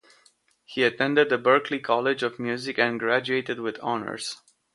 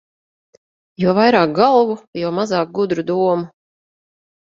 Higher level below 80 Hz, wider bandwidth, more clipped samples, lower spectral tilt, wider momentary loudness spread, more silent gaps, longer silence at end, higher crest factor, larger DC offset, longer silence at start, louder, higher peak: second, -72 dBFS vs -62 dBFS; first, 11.5 kHz vs 7.6 kHz; neither; second, -4.5 dB/octave vs -6.5 dB/octave; about the same, 11 LU vs 10 LU; second, none vs 2.07-2.13 s; second, 0.4 s vs 1.05 s; about the same, 20 dB vs 18 dB; neither; second, 0.7 s vs 1 s; second, -25 LUFS vs -17 LUFS; second, -4 dBFS vs 0 dBFS